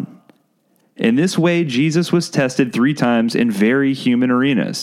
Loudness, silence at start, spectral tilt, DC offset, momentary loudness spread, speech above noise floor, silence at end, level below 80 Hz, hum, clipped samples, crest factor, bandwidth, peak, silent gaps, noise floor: -16 LUFS; 0 s; -6 dB/octave; under 0.1%; 2 LU; 45 dB; 0 s; -64 dBFS; none; under 0.1%; 14 dB; 13.5 kHz; -2 dBFS; none; -61 dBFS